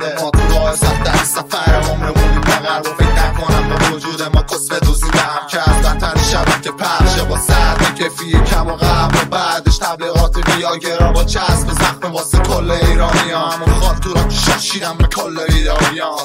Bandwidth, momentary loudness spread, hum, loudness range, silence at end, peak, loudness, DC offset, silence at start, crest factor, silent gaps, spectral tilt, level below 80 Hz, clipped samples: 16.5 kHz; 3 LU; none; 1 LU; 0 s; 0 dBFS; -14 LUFS; under 0.1%; 0 s; 12 dB; none; -4.5 dB/octave; -16 dBFS; under 0.1%